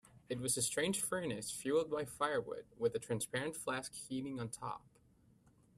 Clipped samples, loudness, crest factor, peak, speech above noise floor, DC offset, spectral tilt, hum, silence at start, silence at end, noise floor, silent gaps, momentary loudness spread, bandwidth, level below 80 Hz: under 0.1%; -39 LUFS; 20 dB; -22 dBFS; 30 dB; under 0.1%; -3.5 dB/octave; none; 0.15 s; 1 s; -69 dBFS; none; 9 LU; 15.5 kHz; -72 dBFS